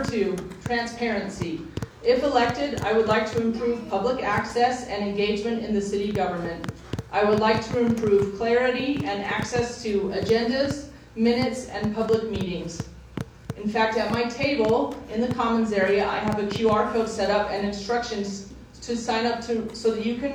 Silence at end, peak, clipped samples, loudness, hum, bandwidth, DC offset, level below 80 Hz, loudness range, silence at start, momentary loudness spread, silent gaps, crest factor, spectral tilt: 0 s; -6 dBFS; under 0.1%; -25 LUFS; none; 14 kHz; under 0.1%; -48 dBFS; 3 LU; 0 s; 11 LU; none; 18 dB; -5.5 dB/octave